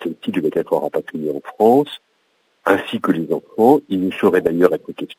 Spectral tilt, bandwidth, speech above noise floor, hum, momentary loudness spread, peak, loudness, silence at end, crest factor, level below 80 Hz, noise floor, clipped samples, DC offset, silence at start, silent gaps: -7 dB/octave; 16 kHz; 46 dB; none; 11 LU; 0 dBFS; -18 LUFS; 0.05 s; 18 dB; -60 dBFS; -63 dBFS; under 0.1%; under 0.1%; 0 s; none